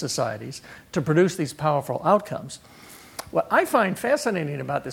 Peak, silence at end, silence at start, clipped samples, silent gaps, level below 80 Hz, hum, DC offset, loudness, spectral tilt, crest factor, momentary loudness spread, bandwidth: -6 dBFS; 0 s; 0 s; under 0.1%; none; -60 dBFS; none; under 0.1%; -24 LUFS; -5.5 dB/octave; 18 dB; 18 LU; 18 kHz